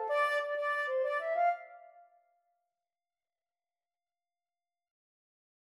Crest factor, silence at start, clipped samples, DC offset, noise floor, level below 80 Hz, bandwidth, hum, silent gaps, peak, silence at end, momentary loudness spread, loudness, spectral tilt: 18 dB; 0 s; under 0.1%; under 0.1%; under -90 dBFS; under -90 dBFS; 13 kHz; none; none; -20 dBFS; 3.85 s; 6 LU; -32 LUFS; 2 dB/octave